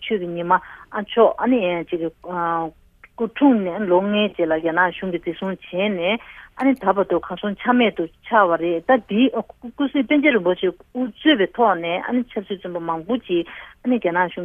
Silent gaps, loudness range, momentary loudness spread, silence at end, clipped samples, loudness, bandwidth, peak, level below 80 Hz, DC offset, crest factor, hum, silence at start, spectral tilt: none; 2 LU; 11 LU; 0 s; under 0.1%; -20 LUFS; 3.8 kHz; -2 dBFS; -56 dBFS; under 0.1%; 18 dB; none; 0 s; -8 dB/octave